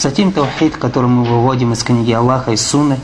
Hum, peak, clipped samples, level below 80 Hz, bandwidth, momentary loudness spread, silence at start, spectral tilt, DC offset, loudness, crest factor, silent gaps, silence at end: none; 0 dBFS; under 0.1%; -40 dBFS; 11 kHz; 3 LU; 0 s; -5.5 dB/octave; under 0.1%; -14 LUFS; 12 dB; none; 0 s